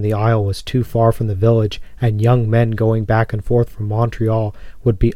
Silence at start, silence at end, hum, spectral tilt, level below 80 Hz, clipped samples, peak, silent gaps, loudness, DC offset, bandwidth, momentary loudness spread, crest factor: 0 s; 0 s; none; -8.5 dB/octave; -32 dBFS; under 0.1%; -2 dBFS; none; -17 LUFS; under 0.1%; 12 kHz; 6 LU; 14 dB